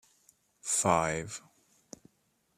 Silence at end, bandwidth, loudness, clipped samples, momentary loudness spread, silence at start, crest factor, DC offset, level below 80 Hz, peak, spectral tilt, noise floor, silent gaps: 1.2 s; 14.5 kHz; -30 LUFS; under 0.1%; 26 LU; 0.65 s; 24 dB; under 0.1%; -64 dBFS; -10 dBFS; -3.5 dB/octave; -74 dBFS; none